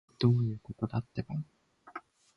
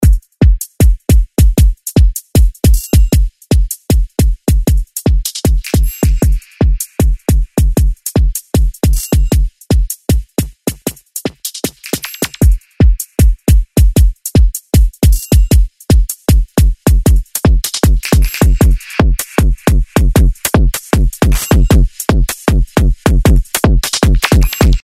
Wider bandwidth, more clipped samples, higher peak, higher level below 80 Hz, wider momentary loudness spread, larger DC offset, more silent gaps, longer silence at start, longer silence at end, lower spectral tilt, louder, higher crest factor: second, 6 kHz vs 16.5 kHz; neither; second, -12 dBFS vs 0 dBFS; second, -60 dBFS vs -12 dBFS; first, 20 LU vs 5 LU; neither; neither; first, 0.2 s vs 0 s; first, 0.35 s vs 0.05 s; first, -9 dB/octave vs -5.5 dB/octave; second, -33 LUFS vs -13 LUFS; first, 20 dB vs 10 dB